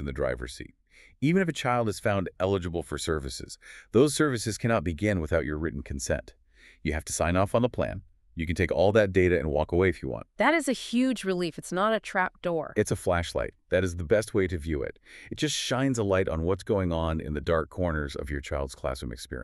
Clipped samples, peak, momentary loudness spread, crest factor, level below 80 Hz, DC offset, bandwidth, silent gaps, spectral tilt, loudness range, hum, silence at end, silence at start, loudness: under 0.1%; -8 dBFS; 11 LU; 20 dB; -42 dBFS; under 0.1%; 13.5 kHz; none; -5.5 dB/octave; 3 LU; none; 0 s; 0 s; -28 LUFS